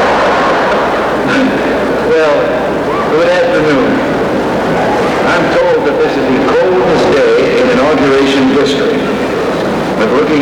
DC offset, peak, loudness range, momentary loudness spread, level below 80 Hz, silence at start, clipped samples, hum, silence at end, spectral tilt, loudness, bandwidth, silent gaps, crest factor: under 0.1%; -2 dBFS; 2 LU; 4 LU; -36 dBFS; 0 s; under 0.1%; none; 0 s; -5.5 dB/octave; -10 LUFS; 17 kHz; none; 8 dB